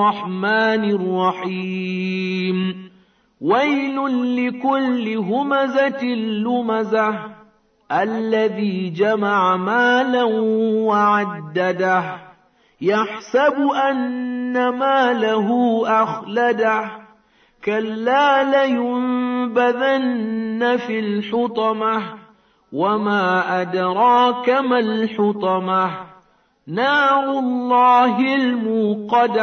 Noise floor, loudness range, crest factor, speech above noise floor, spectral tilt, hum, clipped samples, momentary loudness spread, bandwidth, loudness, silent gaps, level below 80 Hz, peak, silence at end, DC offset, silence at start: -56 dBFS; 3 LU; 14 dB; 38 dB; -6.5 dB/octave; none; under 0.1%; 8 LU; 6.6 kHz; -18 LUFS; none; -68 dBFS; -6 dBFS; 0 s; under 0.1%; 0 s